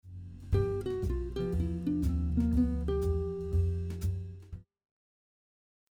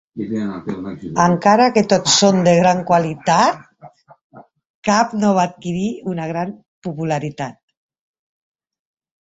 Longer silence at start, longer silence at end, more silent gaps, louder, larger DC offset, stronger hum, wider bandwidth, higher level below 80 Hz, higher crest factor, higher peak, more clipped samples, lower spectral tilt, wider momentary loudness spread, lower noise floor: about the same, 0.05 s vs 0.15 s; second, 1.3 s vs 1.75 s; second, none vs 4.23-4.30 s, 4.70-4.82 s, 6.68-6.82 s; second, -33 LUFS vs -17 LUFS; neither; neither; first, 13.5 kHz vs 8 kHz; first, -38 dBFS vs -56 dBFS; about the same, 16 dB vs 18 dB; second, -16 dBFS vs 0 dBFS; neither; first, -9 dB/octave vs -4.5 dB/octave; about the same, 16 LU vs 15 LU; first, under -90 dBFS vs -44 dBFS